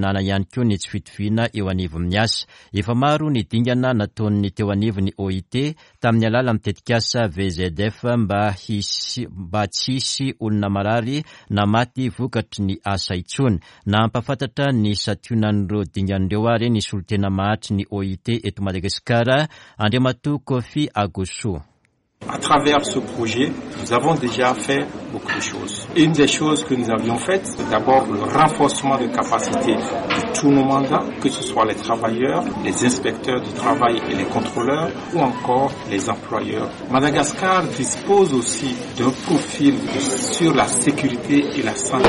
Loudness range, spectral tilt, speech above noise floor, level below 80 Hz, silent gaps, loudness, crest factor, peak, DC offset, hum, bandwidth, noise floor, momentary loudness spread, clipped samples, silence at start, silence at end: 3 LU; -5 dB/octave; 44 dB; -48 dBFS; none; -20 LUFS; 16 dB; -4 dBFS; under 0.1%; none; 11.5 kHz; -63 dBFS; 8 LU; under 0.1%; 0 s; 0 s